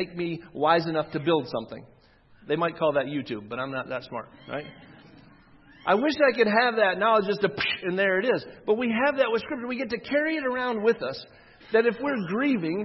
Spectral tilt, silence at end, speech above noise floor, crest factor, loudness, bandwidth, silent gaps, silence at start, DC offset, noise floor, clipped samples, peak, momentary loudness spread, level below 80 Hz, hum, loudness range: -7 dB/octave; 0 s; 30 dB; 20 dB; -25 LUFS; 6 kHz; none; 0 s; under 0.1%; -56 dBFS; under 0.1%; -6 dBFS; 13 LU; -64 dBFS; none; 7 LU